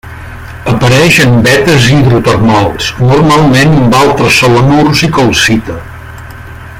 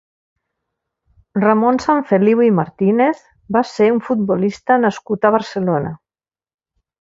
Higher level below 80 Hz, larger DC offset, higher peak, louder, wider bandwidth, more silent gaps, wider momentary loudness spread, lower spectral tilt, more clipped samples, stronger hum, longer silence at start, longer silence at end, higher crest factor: first, -28 dBFS vs -58 dBFS; neither; about the same, 0 dBFS vs 0 dBFS; first, -6 LUFS vs -16 LUFS; first, 16.5 kHz vs 7.8 kHz; neither; first, 21 LU vs 6 LU; second, -5 dB/octave vs -7.5 dB/octave; first, 0.3% vs under 0.1%; neither; second, 0.05 s vs 1.35 s; second, 0 s vs 1.05 s; second, 8 dB vs 18 dB